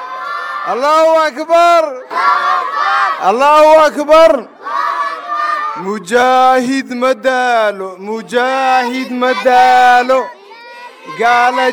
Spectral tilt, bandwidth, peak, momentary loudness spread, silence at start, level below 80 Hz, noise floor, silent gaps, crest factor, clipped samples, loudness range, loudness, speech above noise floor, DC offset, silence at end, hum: -3 dB/octave; 17 kHz; 0 dBFS; 13 LU; 0 s; -52 dBFS; -33 dBFS; none; 12 dB; under 0.1%; 3 LU; -11 LUFS; 23 dB; under 0.1%; 0 s; none